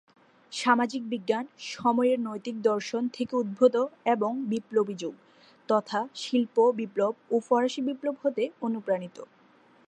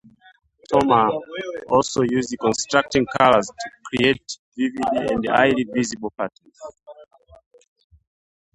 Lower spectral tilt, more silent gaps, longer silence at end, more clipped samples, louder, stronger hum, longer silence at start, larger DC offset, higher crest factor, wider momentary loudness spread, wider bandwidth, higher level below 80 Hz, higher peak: about the same, -5 dB/octave vs -4.5 dB/octave; second, none vs 4.39-4.52 s; second, 0.65 s vs 1.5 s; neither; second, -28 LUFS vs -20 LUFS; neither; second, 0.5 s vs 0.7 s; neither; about the same, 20 dB vs 22 dB; second, 9 LU vs 15 LU; about the same, 10.5 kHz vs 11 kHz; second, -80 dBFS vs -54 dBFS; second, -8 dBFS vs 0 dBFS